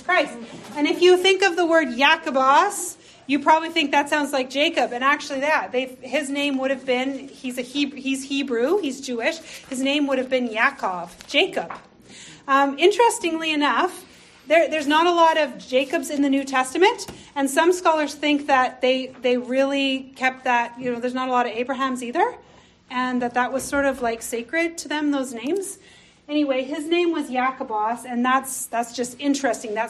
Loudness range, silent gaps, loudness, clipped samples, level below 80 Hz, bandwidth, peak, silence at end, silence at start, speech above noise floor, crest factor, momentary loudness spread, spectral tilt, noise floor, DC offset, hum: 5 LU; none; -21 LUFS; under 0.1%; -62 dBFS; 13 kHz; -4 dBFS; 0 s; 0 s; 23 dB; 18 dB; 10 LU; -2.5 dB/octave; -44 dBFS; under 0.1%; none